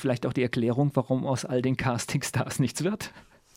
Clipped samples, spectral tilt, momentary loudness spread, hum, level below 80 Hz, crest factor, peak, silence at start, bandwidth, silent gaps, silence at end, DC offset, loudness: under 0.1%; -5.5 dB/octave; 4 LU; none; -56 dBFS; 18 dB; -8 dBFS; 0 s; 16 kHz; none; 0.35 s; under 0.1%; -28 LUFS